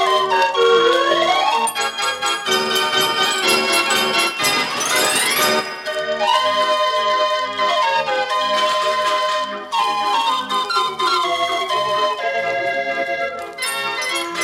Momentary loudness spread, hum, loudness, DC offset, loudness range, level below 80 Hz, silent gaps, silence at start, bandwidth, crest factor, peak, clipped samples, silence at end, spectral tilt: 6 LU; none; -17 LUFS; under 0.1%; 3 LU; -62 dBFS; none; 0 s; 17.5 kHz; 16 dB; -2 dBFS; under 0.1%; 0 s; -1 dB/octave